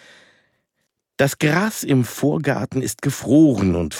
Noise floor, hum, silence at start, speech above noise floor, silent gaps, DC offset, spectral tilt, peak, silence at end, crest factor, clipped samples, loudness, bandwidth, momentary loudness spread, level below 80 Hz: -74 dBFS; none; 1.2 s; 56 dB; none; under 0.1%; -6 dB/octave; -4 dBFS; 0 s; 16 dB; under 0.1%; -19 LUFS; 17.5 kHz; 9 LU; -48 dBFS